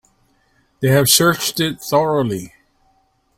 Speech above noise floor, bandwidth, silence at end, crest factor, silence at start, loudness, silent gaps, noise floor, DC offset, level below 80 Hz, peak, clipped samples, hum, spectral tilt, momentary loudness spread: 45 dB; 16.5 kHz; 0.9 s; 18 dB; 0.8 s; -16 LUFS; none; -61 dBFS; under 0.1%; -52 dBFS; 0 dBFS; under 0.1%; none; -3.5 dB/octave; 11 LU